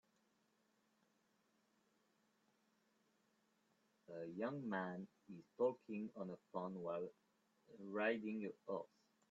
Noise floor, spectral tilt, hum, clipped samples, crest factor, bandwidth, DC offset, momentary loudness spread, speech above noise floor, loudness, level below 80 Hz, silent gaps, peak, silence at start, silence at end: -81 dBFS; -5.5 dB/octave; none; under 0.1%; 22 dB; 7.4 kHz; under 0.1%; 16 LU; 35 dB; -46 LUFS; under -90 dBFS; none; -28 dBFS; 4.1 s; 0.45 s